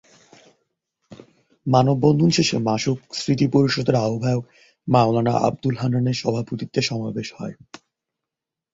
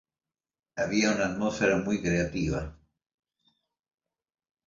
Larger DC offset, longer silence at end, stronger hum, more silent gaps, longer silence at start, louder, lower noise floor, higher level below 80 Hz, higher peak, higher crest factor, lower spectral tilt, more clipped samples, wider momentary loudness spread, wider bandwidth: neither; second, 1.2 s vs 1.95 s; neither; neither; first, 1.1 s vs 0.75 s; first, -21 LUFS vs -28 LUFS; second, -86 dBFS vs under -90 dBFS; second, -56 dBFS vs -50 dBFS; first, -2 dBFS vs -12 dBFS; about the same, 20 dB vs 18 dB; about the same, -6 dB/octave vs -5 dB/octave; neither; first, 12 LU vs 9 LU; about the same, 7.8 kHz vs 7.6 kHz